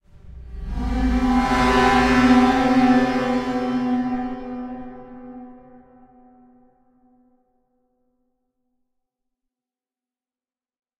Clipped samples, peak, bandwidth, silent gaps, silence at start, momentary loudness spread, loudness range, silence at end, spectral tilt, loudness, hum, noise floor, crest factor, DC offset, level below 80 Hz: under 0.1%; -4 dBFS; 11 kHz; none; 0.15 s; 24 LU; 18 LU; 5.45 s; -5.5 dB/octave; -19 LUFS; none; under -90 dBFS; 18 dB; under 0.1%; -34 dBFS